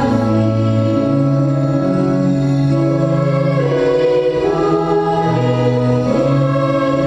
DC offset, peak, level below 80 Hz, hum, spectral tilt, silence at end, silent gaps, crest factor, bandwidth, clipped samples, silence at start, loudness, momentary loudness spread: under 0.1%; -2 dBFS; -42 dBFS; none; -8.5 dB/octave; 0 s; none; 12 dB; 8.2 kHz; under 0.1%; 0 s; -15 LUFS; 1 LU